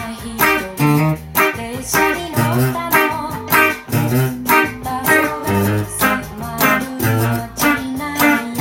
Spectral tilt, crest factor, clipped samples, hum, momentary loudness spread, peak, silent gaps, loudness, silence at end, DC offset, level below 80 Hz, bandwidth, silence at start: -5 dB/octave; 16 dB; under 0.1%; none; 6 LU; 0 dBFS; none; -16 LUFS; 0 s; under 0.1%; -42 dBFS; 17 kHz; 0 s